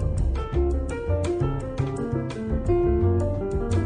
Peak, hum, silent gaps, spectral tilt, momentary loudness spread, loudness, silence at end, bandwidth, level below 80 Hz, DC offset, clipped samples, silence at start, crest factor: -10 dBFS; none; none; -8.5 dB/octave; 6 LU; -26 LUFS; 0 s; 10 kHz; -28 dBFS; under 0.1%; under 0.1%; 0 s; 12 dB